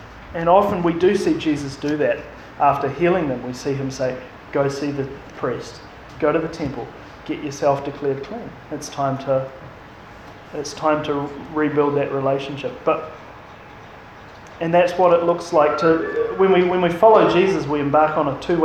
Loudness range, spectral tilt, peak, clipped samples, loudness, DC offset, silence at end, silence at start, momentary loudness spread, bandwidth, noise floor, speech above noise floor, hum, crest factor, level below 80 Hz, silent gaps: 9 LU; -6.5 dB/octave; 0 dBFS; under 0.1%; -20 LUFS; under 0.1%; 0 s; 0 s; 23 LU; 13.5 kHz; -40 dBFS; 21 dB; none; 20 dB; -50 dBFS; none